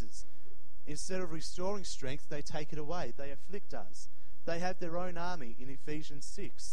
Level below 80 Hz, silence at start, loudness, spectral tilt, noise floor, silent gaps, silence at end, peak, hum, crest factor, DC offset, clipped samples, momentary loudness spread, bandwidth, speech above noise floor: -54 dBFS; 0 s; -42 LUFS; -4.5 dB/octave; -62 dBFS; none; 0 s; -18 dBFS; none; 20 dB; 6%; under 0.1%; 14 LU; 16 kHz; 21 dB